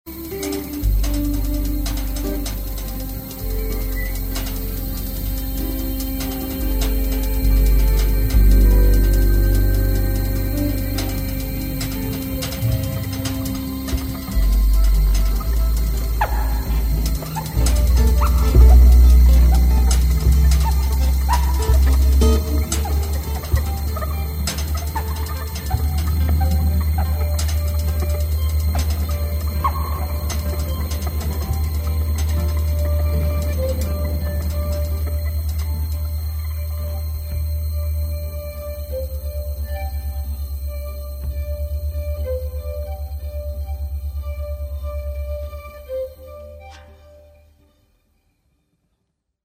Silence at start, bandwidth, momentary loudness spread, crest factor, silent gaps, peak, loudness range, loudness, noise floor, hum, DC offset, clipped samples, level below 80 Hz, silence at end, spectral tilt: 0.05 s; 16 kHz; 12 LU; 16 dB; none; -2 dBFS; 12 LU; -21 LUFS; -73 dBFS; none; under 0.1%; under 0.1%; -20 dBFS; 2.5 s; -6 dB/octave